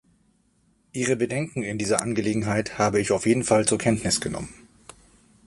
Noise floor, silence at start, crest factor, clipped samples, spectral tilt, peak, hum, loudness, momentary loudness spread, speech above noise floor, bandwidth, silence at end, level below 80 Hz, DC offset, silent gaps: -65 dBFS; 0.95 s; 24 dB; under 0.1%; -4.5 dB/octave; -2 dBFS; none; -24 LUFS; 9 LU; 41 dB; 11.5 kHz; 0.95 s; -52 dBFS; under 0.1%; none